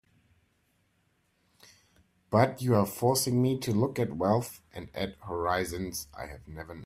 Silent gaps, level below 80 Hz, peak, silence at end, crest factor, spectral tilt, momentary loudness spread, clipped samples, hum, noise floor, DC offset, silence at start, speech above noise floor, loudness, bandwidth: none; -58 dBFS; -8 dBFS; 0 s; 22 dB; -5.5 dB/octave; 16 LU; under 0.1%; none; -72 dBFS; under 0.1%; 2.3 s; 43 dB; -29 LUFS; 16 kHz